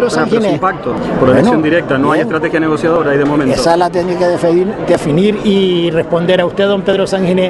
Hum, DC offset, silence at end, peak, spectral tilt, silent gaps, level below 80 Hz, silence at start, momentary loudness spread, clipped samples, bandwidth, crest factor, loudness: none; under 0.1%; 0 s; 0 dBFS; -6.5 dB/octave; none; -40 dBFS; 0 s; 3 LU; under 0.1%; 12 kHz; 12 dB; -12 LUFS